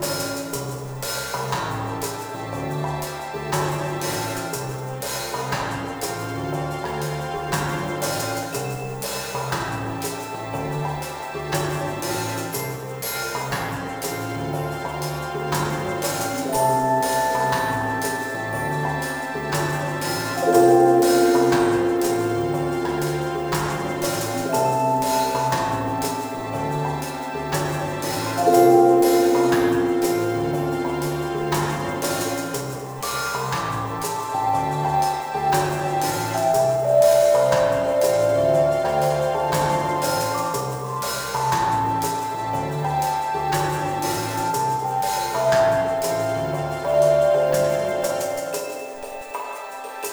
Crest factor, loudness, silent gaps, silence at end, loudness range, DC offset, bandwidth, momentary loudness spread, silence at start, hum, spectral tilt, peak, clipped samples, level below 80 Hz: 20 dB; -22 LUFS; none; 0 s; 8 LU; under 0.1%; over 20 kHz; 11 LU; 0 s; none; -5 dB/octave; -2 dBFS; under 0.1%; -48 dBFS